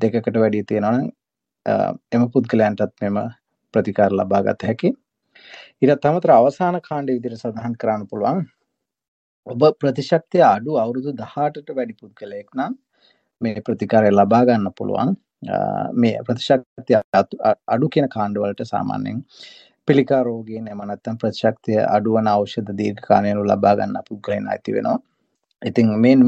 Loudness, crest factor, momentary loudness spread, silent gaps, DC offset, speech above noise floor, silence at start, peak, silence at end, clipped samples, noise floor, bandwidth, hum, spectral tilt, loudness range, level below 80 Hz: -19 LUFS; 18 dB; 13 LU; 9.08-9.43 s, 16.66-16.76 s, 17.04-17.12 s; under 0.1%; 57 dB; 0 s; -2 dBFS; 0 s; under 0.1%; -76 dBFS; 8 kHz; none; -8 dB/octave; 4 LU; -64 dBFS